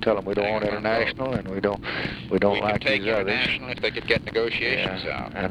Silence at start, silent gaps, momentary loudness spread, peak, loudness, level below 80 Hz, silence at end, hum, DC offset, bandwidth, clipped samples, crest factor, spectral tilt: 0 s; none; 6 LU; -6 dBFS; -24 LUFS; -46 dBFS; 0 s; none; under 0.1%; 11.5 kHz; under 0.1%; 18 dB; -6 dB/octave